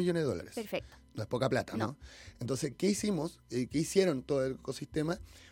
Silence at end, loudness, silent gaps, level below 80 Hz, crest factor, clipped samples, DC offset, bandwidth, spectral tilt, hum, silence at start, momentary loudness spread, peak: 0 s; -34 LUFS; none; -58 dBFS; 20 dB; under 0.1%; under 0.1%; 17 kHz; -5.5 dB/octave; none; 0 s; 11 LU; -14 dBFS